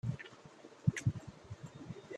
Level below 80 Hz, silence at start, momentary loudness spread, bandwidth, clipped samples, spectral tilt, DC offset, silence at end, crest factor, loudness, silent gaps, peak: -62 dBFS; 0.05 s; 19 LU; 11.5 kHz; under 0.1%; -6.5 dB/octave; under 0.1%; 0 s; 24 dB; -40 LUFS; none; -18 dBFS